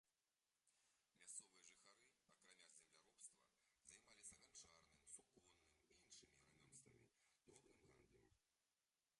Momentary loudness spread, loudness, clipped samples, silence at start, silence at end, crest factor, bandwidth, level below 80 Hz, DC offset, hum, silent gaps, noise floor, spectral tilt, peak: 10 LU; -65 LUFS; under 0.1%; 0.05 s; 0.05 s; 28 dB; 11.5 kHz; under -90 dBFS; under 0.1%; none; none; under -90 dBFS; -1 dB/octave; -44 dBFS